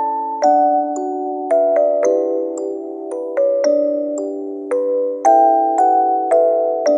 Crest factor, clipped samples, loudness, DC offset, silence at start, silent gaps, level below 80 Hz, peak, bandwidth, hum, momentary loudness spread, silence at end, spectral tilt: 14 dB; under 0.1%; -16 LUFS; under 0.1%; 0 s; none; under -90 dBFS; -2 dBFS; 10 kHz; none; 10 LU; 0 s; -3 dB/octave